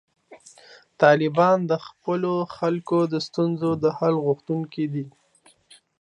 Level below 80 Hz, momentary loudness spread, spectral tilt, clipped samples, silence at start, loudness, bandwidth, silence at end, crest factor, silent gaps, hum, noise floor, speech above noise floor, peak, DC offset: -68 dBFS; 10 LU; -7 dB/octave; under 0.1%; 0.3 s; -23 LUFS; 10.5 kHz; 0.9 s; 22 dB; none; none; -59 dBFS; 37 dB; -2 dBFS; under 0.1%